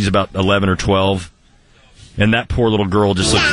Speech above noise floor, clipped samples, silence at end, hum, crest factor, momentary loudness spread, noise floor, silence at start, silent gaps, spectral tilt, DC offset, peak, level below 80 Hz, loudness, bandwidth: 35 dB; under 0.1%; 0 s; none; 14 dB; 7 LU; -50 dBFS; 0 s; none; -5 dB/octave; under 0.1%; -2 dBFS; -32 dBFS; -16 LUFS; 11 kHz